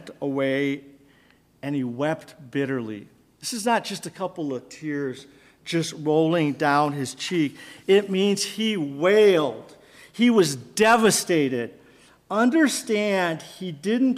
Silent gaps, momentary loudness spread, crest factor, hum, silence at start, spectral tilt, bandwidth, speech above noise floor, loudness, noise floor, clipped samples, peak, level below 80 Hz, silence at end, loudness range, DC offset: none; 14 LU; 16 dB; none; 0 s; -4.5 dB/octave; 15.5 kHz; 36 dB; -23 LUFS; -58 dBFS; under 0.1%; -6 dBFS; -68 dBFS; 0 s; 8 LU; under 0.1%